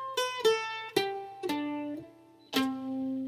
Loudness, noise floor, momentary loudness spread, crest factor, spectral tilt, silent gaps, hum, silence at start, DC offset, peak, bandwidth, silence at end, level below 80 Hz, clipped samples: -32 LUFS; -54 dBFS; 10 LU; 20 dB; -3 dB/octave; none; none; 0 s; under 0.1%; -12 dBFS; 16 kHz; 0 s; -74 dBFS; under 0.1%